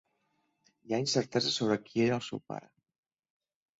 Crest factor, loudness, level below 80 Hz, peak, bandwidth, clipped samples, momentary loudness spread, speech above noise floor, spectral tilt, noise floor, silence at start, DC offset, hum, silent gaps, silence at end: 20 dB; -31 LUFS; -72 dBFS; -14 dBFS; 8.2 kHz; under 0.1%; 12 LU; 46 dB; -4.5 dB/octave; -77 dBFS; 0.85 s; under 0.1%; none; none; 1.2 s